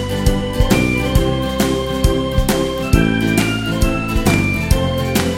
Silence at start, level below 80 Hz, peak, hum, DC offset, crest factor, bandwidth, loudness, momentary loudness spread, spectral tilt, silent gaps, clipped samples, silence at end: 0 s; -22 dBFS; 0 dBFS; none; under 0.1%; 16 dB; 16.5 kHz; -17 LUFS; 3 LU; -5.5 dB/octave; none; under 0.1%; 0 s